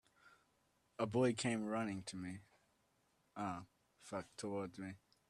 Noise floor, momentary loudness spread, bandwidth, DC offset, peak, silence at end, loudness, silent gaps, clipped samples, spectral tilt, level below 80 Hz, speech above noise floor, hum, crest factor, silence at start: -79 dBFS; 18 LU; 12.5 kHz; under 0.1%; -24 dBFS; 0.35 s; -43 LUFS; none; under 0.1%; -5.5 dB/octave; -78 dBFS; 37 dB; none; 22 dB; 0.25 s